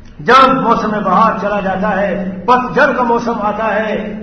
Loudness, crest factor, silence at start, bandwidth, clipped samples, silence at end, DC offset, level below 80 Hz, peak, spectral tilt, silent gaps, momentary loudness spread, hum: -13 LUFS; 12 dB; 0 s; 9.4 kHz; 0.2%; 0 s; 0.1%; -40 dBFS; 0 dBFS; -6 dB/octave; none; 9 LU; none